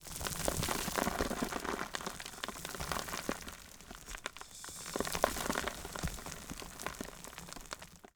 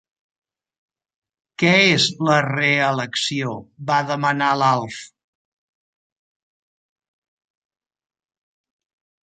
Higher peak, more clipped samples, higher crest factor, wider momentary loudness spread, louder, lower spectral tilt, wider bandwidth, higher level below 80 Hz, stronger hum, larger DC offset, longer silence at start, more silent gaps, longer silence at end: second, -10 dBFS vs -2 dBFS; neither; first, 30 dB vs 22 dB; about the same, 13 LU vs 13 LU; second, -39 LUFS vs -18 LUFS; about the same, -3 dB/octave vs -4 dB/octave; first, over 20 kHz vs 9.4 kHz; first, -52 dBFS vs -66 dBFS; neither; neither; second, 0 s vs 1.6 s; neither; second, 0.1 s vs 4.2 s